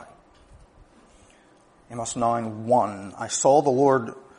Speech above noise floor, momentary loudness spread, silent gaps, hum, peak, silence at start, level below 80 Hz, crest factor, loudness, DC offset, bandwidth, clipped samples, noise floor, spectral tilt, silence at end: 34 dB; 14 LU; none; none; -6 dBFS; 0 s; -60 dBFS; 20 dB; -23 LUFS; under 0.1%; 10.5 kHz; under 0.1%; -56 dBFS; -5 dB/octave; 0.2 s